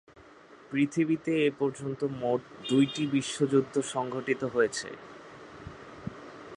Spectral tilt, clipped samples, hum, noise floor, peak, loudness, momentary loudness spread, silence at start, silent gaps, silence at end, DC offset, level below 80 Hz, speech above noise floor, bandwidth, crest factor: -5.5 dB/octave; under 0.1%; none; -54 dBFS; -12 dBFS; -29 LUFS; 19 LU; 0.15 s; none; 0 s; under 0.1%; -64 dBFS; 25 dB; 11 kHz; 18 dB